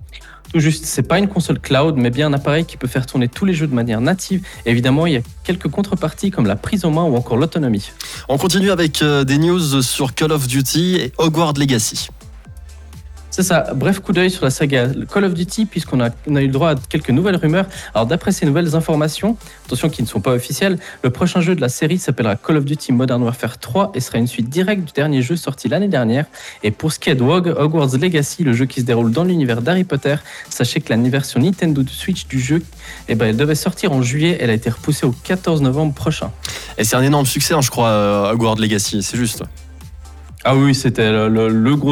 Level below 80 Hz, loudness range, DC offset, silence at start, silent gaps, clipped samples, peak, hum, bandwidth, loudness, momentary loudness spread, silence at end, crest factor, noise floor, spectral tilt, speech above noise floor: -40 dBFS; 2 LU; under 0.1%; 0 s; none; under 0.1%; -4 dBFS; none; 19 kHz; -17 LUFS; 6 LU; 0 s; 12 dB; -36 dBFS; -5.5 dB/octave; 20 dB